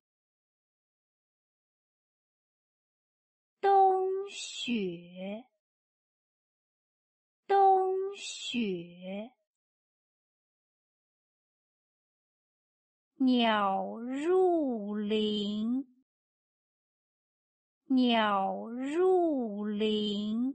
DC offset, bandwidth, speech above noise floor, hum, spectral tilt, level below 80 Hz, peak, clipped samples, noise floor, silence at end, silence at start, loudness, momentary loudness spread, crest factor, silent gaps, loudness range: under 0.1%; 8.4 kHz; over 60 dB; none; -5 dB/octave; -78 dBFS; -16 dBFS; under 0.1%; under -90 dBFS; 0 s; 3.65 s; -29 LUFS; 17 LU; 18 dB; 5.60-7.43 s, 9.47-13.11 s, 16.02-17.81 s; 10 LU